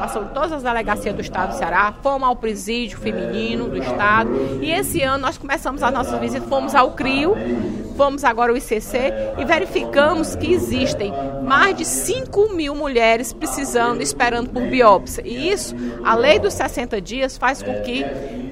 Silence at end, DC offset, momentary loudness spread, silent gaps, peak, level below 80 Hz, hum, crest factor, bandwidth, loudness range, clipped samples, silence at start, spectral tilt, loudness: 0 s; under 0.1%; 9 LU; none; 0 dBFS; -38 dBFS; none; 20 dB; 16 kHz; 3 LU; under 0.1%; 0 s; -4 dB/octave; -19 LUFS